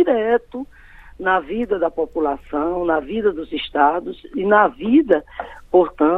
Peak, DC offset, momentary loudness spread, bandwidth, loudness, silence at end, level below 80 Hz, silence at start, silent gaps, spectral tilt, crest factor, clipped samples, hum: 0 dBFS; under 0.1%; 12 LU; 4.4 kHz; -19 LUFS; 0 s; -46 dBFS; 0 s; none; -8 dB/octave; 18 dB; under 0.1%; none